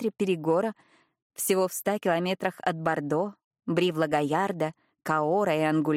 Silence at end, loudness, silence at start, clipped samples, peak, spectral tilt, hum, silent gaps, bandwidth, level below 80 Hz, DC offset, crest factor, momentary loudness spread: 0 s; -27 LUFS; 0 s; under 0.1%; -12 dBFS; -5 dB/octave; none; 1.22-1.30 s, 3.44-3.51 s; 16.5 kHz; -72 dBFS; under 0.1%; 16 dB; 8 LU